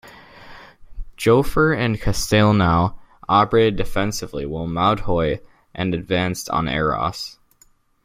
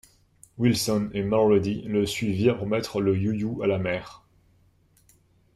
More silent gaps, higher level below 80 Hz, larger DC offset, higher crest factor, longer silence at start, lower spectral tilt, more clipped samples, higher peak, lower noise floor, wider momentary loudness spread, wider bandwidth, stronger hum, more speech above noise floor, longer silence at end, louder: neither; first, -36 dBFS vs -56 dBFS; neither; about the same, 18 dB vs 18 dB; second, 0.05 s vs 0.6 s; about the same, -5.5 dB/octave vs -6 dB/octave; neither; first, -2 dBFS vs -8 dBFS; second, -57 dBFS vs -62 dBFS; first, 11 LU vs 6 LU; about the same, 16.5 kHz vs 15 kHz; neither; about the same, 38 dB vs 38 dB; second, 0.75 s vs 1.4 s; first, -20 LUFS vs -25 LUFS